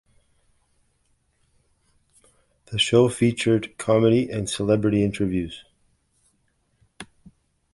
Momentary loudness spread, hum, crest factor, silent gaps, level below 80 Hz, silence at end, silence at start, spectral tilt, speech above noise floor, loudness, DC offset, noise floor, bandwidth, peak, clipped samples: 24 LU; none; 20 dB; none; -52 dBFS; 0.7 s; 2.7 s; -5.5 dB/octave; 47 dB; -22 LUFS; under 0.1%; -68 dBFS; 11.5 kHz; -4 dBFS; under 0.1%